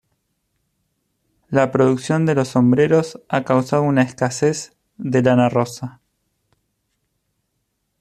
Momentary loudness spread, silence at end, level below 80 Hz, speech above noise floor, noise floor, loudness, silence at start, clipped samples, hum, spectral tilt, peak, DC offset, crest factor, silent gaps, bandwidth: 12 LU; 2.1 s; -60 dBFS; 55 dB; -72 dBFS; -18 LUFS; 1.5 s; under 0.1%; none; -6.5 dB/octave; -2 dBFS; under 0.1%; 18 dB; none; 13 kHz